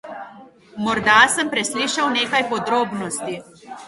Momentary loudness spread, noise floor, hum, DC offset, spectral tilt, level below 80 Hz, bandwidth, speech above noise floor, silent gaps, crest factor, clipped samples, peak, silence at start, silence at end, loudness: 22 LU; -44 dBFS; none; under 0.1%; -2 dB/octave; -58 dBFS; 12 kHz; 25 dB; none; 20 dB; under 0.1%; 0 dBFS; 0.05 s; 0 s; -18 LUFS